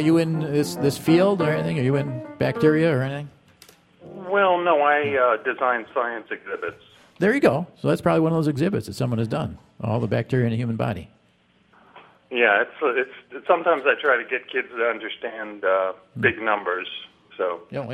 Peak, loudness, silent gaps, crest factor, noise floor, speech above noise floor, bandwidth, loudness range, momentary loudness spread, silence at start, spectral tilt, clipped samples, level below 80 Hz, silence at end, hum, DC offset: -4 dBFS; -22 LUFS; none; 20 dB; -61 dBFS; 39 dB; 15.5 kHz; 4 LU; 13 LU; 0 s; -6.5 dB/octave; under 0.1%; -58 dBFS; 0 s; none; under 0.1%